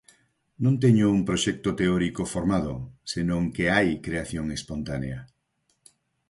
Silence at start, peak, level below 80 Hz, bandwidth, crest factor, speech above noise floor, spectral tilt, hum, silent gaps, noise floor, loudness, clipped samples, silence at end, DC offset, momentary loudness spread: 0.6 s; -8 dBFS; -46 dBFS; 11.5 kHz; 18 dB; 48 dB; -6 dB/octave; none; none; -73 dBFS; -25 LUFS; under 0.1%; 1.05 s; under 0.1%; 12 LU